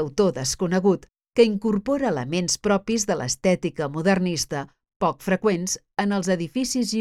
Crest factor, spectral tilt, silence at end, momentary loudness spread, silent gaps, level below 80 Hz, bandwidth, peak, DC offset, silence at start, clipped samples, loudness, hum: 18 dB; -4.5 dB/octave; 0 s; 6 LU; 4.96-5.00 s; -52 dBFS; 15 kHz; -4 dBFS; under 0.1%; 0 s; under 0.1%; -23 LUFS; none